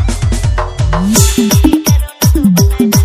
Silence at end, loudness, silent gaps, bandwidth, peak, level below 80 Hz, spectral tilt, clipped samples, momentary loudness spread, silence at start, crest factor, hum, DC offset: 0 s; -11 LUFS; none; 16.5 kHz; 0 dBFS; -16 dBFS; -5 dB/octave; 0.4%; 6 LU; 0 s; 10 dB; none; under 0.1%